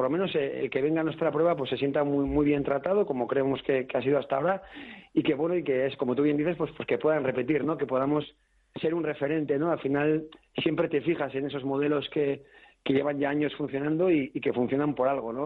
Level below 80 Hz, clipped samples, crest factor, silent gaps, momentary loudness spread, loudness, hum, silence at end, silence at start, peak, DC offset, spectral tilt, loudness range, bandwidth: -56 dBFS; under 0.1%; 14 dB; none; 5 LU; -28 LUFS; none; 0 s; 0 s; -12 dBFS; under 0.1%; -9.5 dB/octave; 2 LU; 4.5 kHz